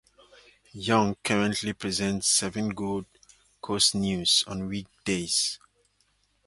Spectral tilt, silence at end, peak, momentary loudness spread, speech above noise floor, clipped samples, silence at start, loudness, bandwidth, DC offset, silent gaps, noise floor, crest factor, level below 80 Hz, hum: -3 dB/octave; 0.9 s; -6 dBFS; 12 LU; 42 dB; under 0.1%; 0.75 s; -26 LUFS; 12 kHz; under 0.1%; none; -69 dBFS; 22 dB; -56 dBFS; 50 Hz at -50 dBFS